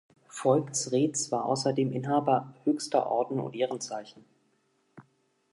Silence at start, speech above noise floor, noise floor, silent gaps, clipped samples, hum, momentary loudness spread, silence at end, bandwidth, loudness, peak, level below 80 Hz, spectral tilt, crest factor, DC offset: 0.35 s; 43 dB; -72 dBFS; none; under 0.1%; none; 7 LU; 0.5 s; 11.5 kHz; -29 LUFS; -10 dBFS; -80 dBFS; -5 dB/octave; 20 dB; under 0.1%